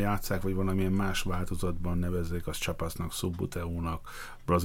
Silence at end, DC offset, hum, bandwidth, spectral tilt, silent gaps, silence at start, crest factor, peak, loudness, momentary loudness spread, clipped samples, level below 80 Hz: 0 s; under 0.1%; none; 17 kHz; -5.5 dB/octave; none; 0 s; 16 dB; -14 dBFS; -33 LUFS; 6 LU; under 0.1%; -40 dBFS